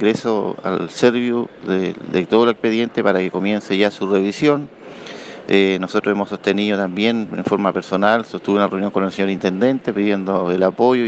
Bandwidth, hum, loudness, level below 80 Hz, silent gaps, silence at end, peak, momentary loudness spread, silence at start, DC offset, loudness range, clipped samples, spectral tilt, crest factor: 8.4 kHz; none; -18 LUFS; -62 dBFS; none; 0 s; 0 dBFS; 6 LU; 0 s; under 0.1%; 1 LU; under 0.1%; -6.5 dB/octave; 18 dB